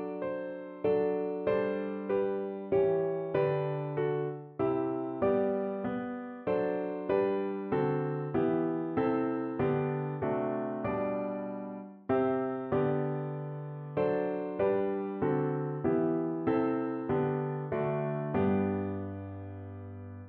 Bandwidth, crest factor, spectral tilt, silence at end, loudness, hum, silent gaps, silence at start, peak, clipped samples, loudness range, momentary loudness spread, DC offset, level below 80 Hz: 4.3 kHz; 14 dB; -8 dB/octave; 0 s; -32 LUFS; none; none; 0 s; -16 dBFS; under 0.1%; 2 LU; 9 LU; under 0.1%; -64 dBFS